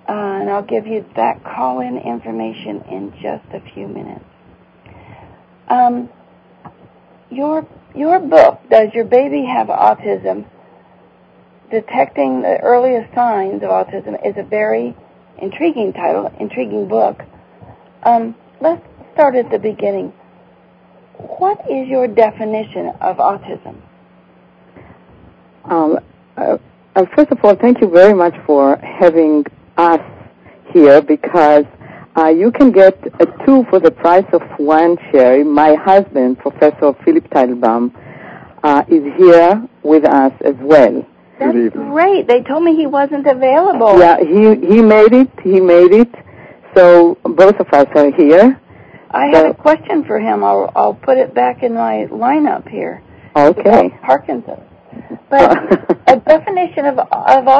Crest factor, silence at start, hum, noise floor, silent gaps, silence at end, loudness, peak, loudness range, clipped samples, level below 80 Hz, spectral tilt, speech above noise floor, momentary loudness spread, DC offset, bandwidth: 12 dB; 0.1 s; none; -47 dBFS; none; 0 s; -11 LUFS; 0 dBFS; 12 LU; 1%; -50 dBFS; -7.5 dB/octave; 36 dB; 16 LU; under 0.1%; 8 kHz